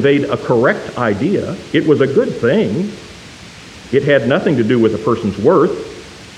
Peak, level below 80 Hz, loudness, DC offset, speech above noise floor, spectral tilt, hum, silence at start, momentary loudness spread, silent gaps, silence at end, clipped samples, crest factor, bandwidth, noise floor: 0 dBFS; -48 dBFS; -15 LUFS; under 0.1%; 22 dB; -7 dB/octave; none; 0 s; 20 LU; none; 0 s; under 0.1%; 14 dB; 11 kHz; -35 dBFS